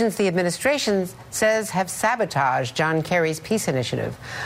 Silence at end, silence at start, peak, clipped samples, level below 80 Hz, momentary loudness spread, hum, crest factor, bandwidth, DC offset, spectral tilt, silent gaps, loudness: 0 s; 0 s; -6 dBFS; under 0.1%; -56 dBFS; 5 LU; none; 16 dB; 16 kHz; under 0.1%; -4.5 dB/octave; none; -22 LUFS